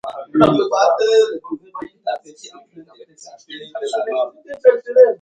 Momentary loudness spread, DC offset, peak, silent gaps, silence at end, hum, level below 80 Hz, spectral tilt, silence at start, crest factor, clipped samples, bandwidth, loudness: 17 LU; under 0.1%; 0 dBFS; none; 0.05 s; none; -58 dBFS; -5.5 dB/octave; 0.05 s; 18 dB; under 0.1%; 9 kHz; -17 LUFS